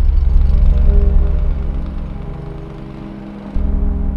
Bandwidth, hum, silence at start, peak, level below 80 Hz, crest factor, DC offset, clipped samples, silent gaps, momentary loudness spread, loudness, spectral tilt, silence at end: 3.7 kHz; none; 0 s; 0 dBFS; -14 dBFS; 12 dB; under 0.1%; under 0.1%; none; 15 LU; -18 LUFS; -10 dB/octave; 0 s